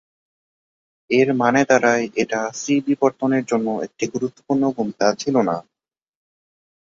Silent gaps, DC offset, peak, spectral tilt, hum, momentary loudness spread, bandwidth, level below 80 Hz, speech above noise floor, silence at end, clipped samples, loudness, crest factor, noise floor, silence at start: none; under 0.1%; -2 dBFS; -5 dB/octave; none; 9 LU; 7.8 kHz; -64 dBFS; over 71 dB; 1.35 s; under 0.1%; -20 LUFS; 18 dB; under -90 dBFS; 1.1 s